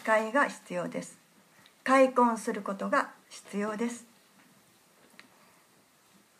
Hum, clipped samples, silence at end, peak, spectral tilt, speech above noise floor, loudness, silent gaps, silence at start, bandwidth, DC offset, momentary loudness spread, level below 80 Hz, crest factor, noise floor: none; under 0.1%; 2.35 s; -10 dBFS; -4.5 dB/octave; 35 dB; -29 LUFS; none; 0 s; 15 kHz; under 0.1%; 16 LU; -86 dBFS; 22 dB; -63 dBFS